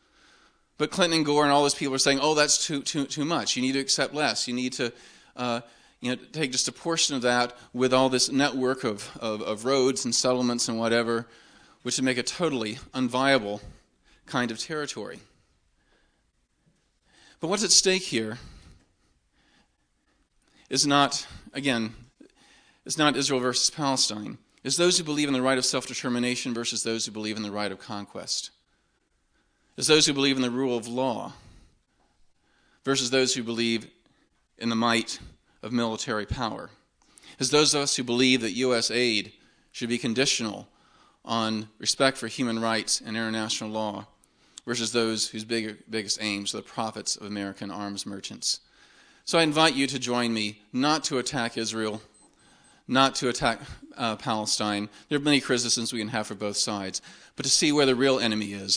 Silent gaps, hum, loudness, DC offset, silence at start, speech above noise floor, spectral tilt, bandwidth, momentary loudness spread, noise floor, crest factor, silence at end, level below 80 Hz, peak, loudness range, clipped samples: none; none; -25 LUFS; under 0.1%; 0.8 s; 44 dB; -2.5 dB/octave; 10.5 kHz; 13 LU; -71 dBFS; 24 dB; 0 s; -58 dBFS; -4 dBFS; 5 LU; under 0.1%